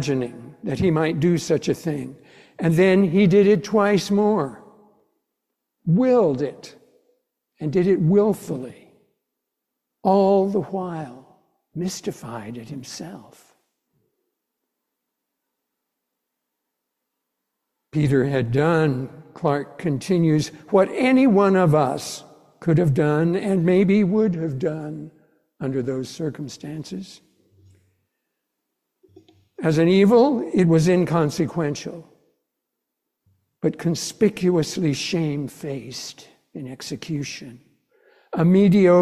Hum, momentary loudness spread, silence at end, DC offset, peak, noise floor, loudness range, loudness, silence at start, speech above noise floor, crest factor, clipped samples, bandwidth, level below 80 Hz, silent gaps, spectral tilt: none; 18 LU; 0 s; under 0.1%; -4 dBFS; -81 dBFS; 13 LU; -20 LUFS; 0 s; 61 dB; 18 dB; under 0.1%; 13.5 kHz; -56 dBFS; none; -7 dB/octave